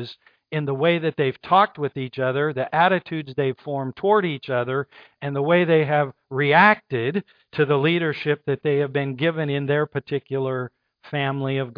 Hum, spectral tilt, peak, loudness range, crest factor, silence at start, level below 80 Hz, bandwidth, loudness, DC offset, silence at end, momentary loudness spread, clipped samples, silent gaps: none; -9 dB/octave; -2 dBFS; 4 LU; 20 dB; 0 s; -68 dBFS; 5.2 kHz; -22 LUFS; under 0.1%; 0.05 s; 11 LU; under 0.1%; none